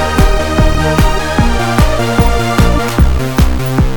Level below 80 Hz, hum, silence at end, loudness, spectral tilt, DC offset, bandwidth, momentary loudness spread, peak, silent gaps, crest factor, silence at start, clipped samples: -14 dBFS; none; 0 s; -12 LUFS; -6 dB/octave; under 0.1%; 19 kHz; 1 LU; 0 dBFS; none; 10 dB; 0 s; 0.2%